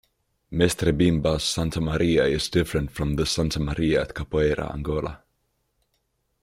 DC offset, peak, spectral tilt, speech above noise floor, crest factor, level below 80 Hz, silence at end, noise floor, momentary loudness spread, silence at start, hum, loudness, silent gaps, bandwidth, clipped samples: under 0.1%; -4 dBFS; -5.5 dB/octave; 50 dB; 20 dB; -38 dBFS; 1.25 s; -73 dBFS; 7 LU; 0.5 s; none; -24 LUFS; none; 16 kHz; under 0.1%